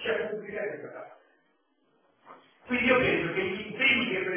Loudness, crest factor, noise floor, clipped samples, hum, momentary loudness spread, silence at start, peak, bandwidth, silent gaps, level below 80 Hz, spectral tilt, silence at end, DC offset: -27 LUFS; 20 dB; -71 dBFS; under 0.1%; none; 16 LU; 0 s; -10 dBFS; 3.6 kHz; none; -60 dBFS; -2 dB/octave; 0 s; under 0.1%